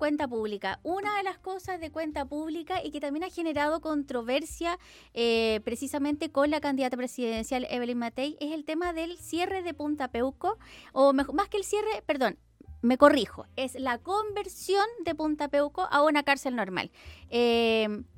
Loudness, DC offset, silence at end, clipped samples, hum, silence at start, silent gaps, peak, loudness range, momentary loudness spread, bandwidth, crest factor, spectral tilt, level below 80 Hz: -29 LUFS; under 0.1%; 0.1 s; under 0.1%; none; 0 s; none; -4 dBFS; 6 LU; 11 LU; 17 kHz; 24 dB; -4 dB/octave; -56 dBFS